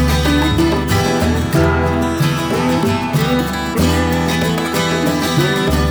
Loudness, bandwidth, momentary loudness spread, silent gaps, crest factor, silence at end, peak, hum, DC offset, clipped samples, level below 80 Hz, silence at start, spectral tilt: -15 LUFS; over 20 kHz; 3 LU; none; 12 dB; 0 s; -4 dBFS; none; 0.1%; under 0.1%; -26 dBFS; 0 s; -5.5 dB/octave